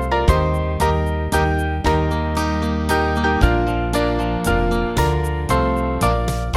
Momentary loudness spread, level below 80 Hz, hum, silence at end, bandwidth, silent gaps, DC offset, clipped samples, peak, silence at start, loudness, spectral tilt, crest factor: 3 LU; -24 dBFS; none; 0 s; 15.5 kHz; none; under 0.1%; under 0.1%; 0 dBFS; 0 s; -19 LUFS; -6 dB/octave; 18 dB